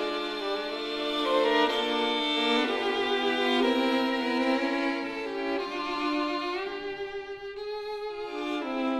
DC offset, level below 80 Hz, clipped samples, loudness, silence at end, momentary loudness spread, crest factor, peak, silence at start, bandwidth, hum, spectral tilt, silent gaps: under 0.1%; -62 dBFS; under 0.1%; -28 LUFS; 0 s; 11 LU; 16 dB; -12 dBFS; 0 s; 13.5 kHz; none; -3 dB/octave; none